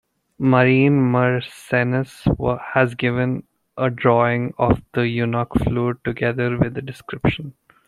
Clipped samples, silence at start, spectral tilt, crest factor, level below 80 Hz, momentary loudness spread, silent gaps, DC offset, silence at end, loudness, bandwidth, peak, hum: under 0.1%; 0.4 s; -8 dB/octave; 18 dB; -40 dBFS; 8 LU; none; under 0.1%; 0.35 s; -20 LUFS; 12 kHz; -2 dBFS; none